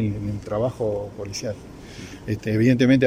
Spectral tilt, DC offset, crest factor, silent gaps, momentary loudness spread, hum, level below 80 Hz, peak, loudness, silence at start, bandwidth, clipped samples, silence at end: -6.5 dB/octave; under 0.1%; 18 dB; none; 19 LU; none; -46 dBFS; -6 dBFS; -24 LUFS; 0 s; 14 kHz; under 0.1%; 0 s